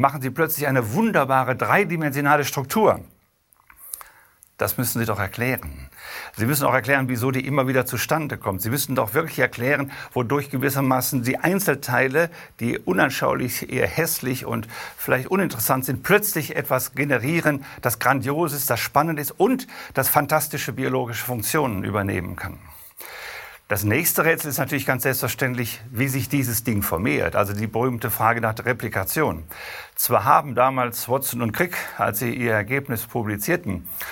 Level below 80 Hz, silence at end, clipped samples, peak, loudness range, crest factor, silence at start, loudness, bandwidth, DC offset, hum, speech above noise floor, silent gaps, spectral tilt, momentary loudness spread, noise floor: -52 dBFS; 0 s; under 0.1%; 0 dBFS; 3 LU; 22 dB; 0 s; -22 LUFS; 17.5 kHz; under 0.1%; none; 39 dB; none; -5 dB/octave; 9 LU; -61 dBFS